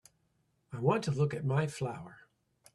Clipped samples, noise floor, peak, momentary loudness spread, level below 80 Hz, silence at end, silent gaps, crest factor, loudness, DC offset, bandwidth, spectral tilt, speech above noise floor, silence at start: under 0.1%; -75 dBFS; -16 dBFS; 16 LU; -68 dBFS; 0.55 s; none; 20 dB; -33 LUFS; under 0.1%; 12 kHz; -7 dB/octave; 44 dB; 0.7 s